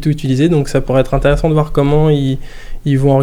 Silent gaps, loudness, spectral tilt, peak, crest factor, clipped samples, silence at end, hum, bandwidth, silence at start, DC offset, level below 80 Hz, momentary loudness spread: none; -14 LUFS; -8 dB/octave; 0 dBFS; 12 dB; under 0.1%; 0 s; none; 13 kHz; 0 s; under 0.1%; -24 dBFS; 6 LU